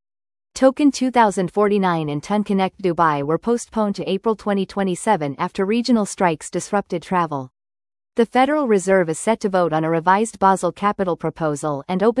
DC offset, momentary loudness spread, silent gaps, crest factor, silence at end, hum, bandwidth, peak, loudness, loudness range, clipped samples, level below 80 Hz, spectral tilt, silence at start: under 0.1%; 6 LU; none; 18 dB; 0 s; none; 12 kHz; -2 dBFS; -20 LUFS; 3 LU; under 0.1%; -56 dBFS; -5.5 dB/octave; 0.55 s